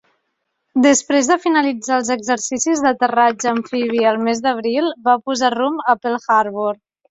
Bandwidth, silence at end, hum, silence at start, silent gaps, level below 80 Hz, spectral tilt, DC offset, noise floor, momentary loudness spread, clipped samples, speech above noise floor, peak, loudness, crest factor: 8.4 kHz; 0.35 s; none; 0.75 s; none; -62 dBFS; -2.5 dB/octave; under 0.1%; -72 dBFS; 5 LU; under 0.1%; 56 dB; -2 dBFS; -17 LUFS; 16 dB